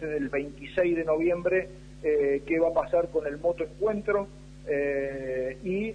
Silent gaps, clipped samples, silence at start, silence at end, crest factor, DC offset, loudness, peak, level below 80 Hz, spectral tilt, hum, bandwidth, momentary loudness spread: none; under 0.1%; 0 s; 0 s; 16 dB; under 0.1%; -28 LUFS; -12 dBFS; -50 dBFS; -7.5 dB/octave; 50 Hz at -50 dBFS; 10 kHz; 7 LU